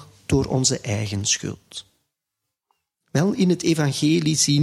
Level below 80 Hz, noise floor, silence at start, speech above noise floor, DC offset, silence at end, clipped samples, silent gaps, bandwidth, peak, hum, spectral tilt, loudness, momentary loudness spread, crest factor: -48 dBFS; -82 dBFS; 0 s; 61 dB; under 0.1%; 0 s; under 0.1%; none; 14.5 kHz; -6 dBFS; none; -4.5 dB/octave; -21 LUFS; 12 LU; 18 dB